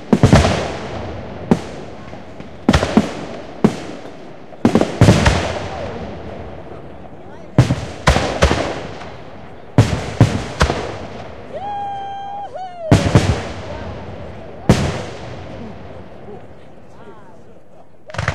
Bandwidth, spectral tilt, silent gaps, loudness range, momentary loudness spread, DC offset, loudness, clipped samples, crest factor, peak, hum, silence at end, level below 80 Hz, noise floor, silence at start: 13.5 kHz; -6 dB/octave; none; 7 LU; 22 LU; 2%; -18 LUFS; under 0.1%; 18 dB; 0 dBFS; none; 0 s; -30 dBFS; -46 dBFS; 0 s